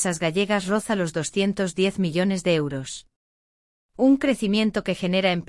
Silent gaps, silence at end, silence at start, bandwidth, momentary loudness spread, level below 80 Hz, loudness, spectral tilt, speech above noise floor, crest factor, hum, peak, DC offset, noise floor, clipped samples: 3.16-3.89 s; 0.05 s; 0 s; 12 kHz; 5 LU; -54 dBFS; -23 LUFS; -5 dB/octave; over 67 dB; 16 dB; none; -8 dBFS; under 0.1%; under -90 dBFS; under 0.1%